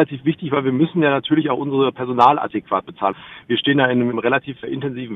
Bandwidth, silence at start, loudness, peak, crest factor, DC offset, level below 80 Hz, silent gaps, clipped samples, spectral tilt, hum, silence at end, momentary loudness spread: 6.4 kHz; 0 s; -19 LUFS; 0 dBFS; 18 dB; under 0.1%; -60 dBFS; none; under 0.1%; -8 dB/octave; none; 0 s; 10 LU